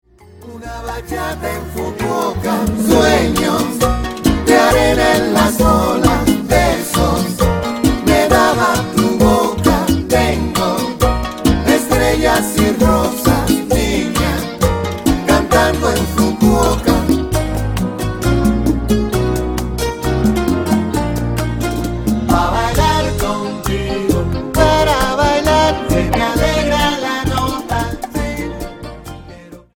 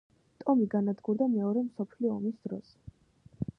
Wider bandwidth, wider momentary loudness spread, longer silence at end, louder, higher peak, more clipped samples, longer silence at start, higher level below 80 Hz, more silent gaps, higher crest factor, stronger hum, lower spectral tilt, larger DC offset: first, 18 kHz vs 5.6 kHz; second, 9 LU vs 13 LU; about the same, 0.2 s vs 0.15 s; first, -15 LUFS vs -31 LUFS; first, 0 dBFS vs -16 dBFS; neither; about the same, 0.35 s vs 0.4 s; first, -24 dBFS vs -64 dBFS; neither; about the same, 14 dB vs 16 dB; neither; second, -5 dB/octave vs -11 dB/octave; neither